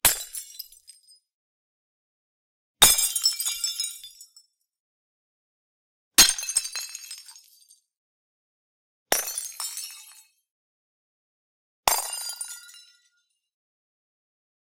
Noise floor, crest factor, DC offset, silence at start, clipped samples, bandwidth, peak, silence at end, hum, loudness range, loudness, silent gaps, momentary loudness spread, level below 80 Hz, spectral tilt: -72 dBFS; 28 dB; under 0.1%; 0.05 s; under 0.1%; 17 kHz; -2 dBFS; 2 s; none; 9 LU; -22 LUFS; 1.33-2.74 s, 4.80-6.11 s, 7.97-9.06 s, 10.51-11.83 s; 25 LU; -56 dBFS; 1 dB/octave